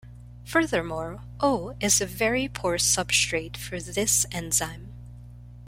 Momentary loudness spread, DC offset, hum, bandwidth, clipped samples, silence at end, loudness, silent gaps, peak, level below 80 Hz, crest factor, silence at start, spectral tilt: 16 LU; under 0.1%; 60 Hz at -40 dBFS; 16.5 kHz; under 0.1%; 0 s; -25 LUFS; none; -8 dBFS; -46 dBFS; 20 dB; 0.05 s; -2.5 dB/octave